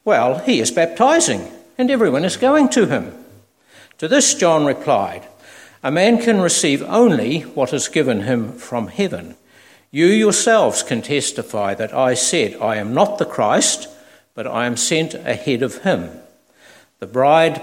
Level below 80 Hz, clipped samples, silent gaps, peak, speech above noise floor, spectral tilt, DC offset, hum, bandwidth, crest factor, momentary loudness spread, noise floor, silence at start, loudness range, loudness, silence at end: -62 dBFS; under 0.1%; none; 0 dBFS; 33 dB; -3.5 dB/octave; under 0.1%; none; 16.5 kHz; 16 dB; 12 LU; -49 dBFS; 0.05 s; 3 LU; -17 LUFS; 0 s